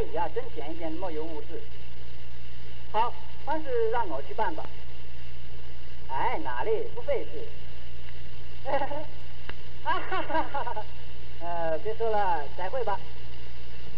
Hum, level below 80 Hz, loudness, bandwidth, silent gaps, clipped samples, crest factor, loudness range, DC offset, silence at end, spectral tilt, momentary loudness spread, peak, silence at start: 60 Hz at -45 dBFS; -48 dBFS; -32 LUFS; 7.6 kHz; none; under 0.1%; 18 dB; 4 LU; 10%; 0 s; -7 dB/octave; 17 LU; -12 dBFS; 0 s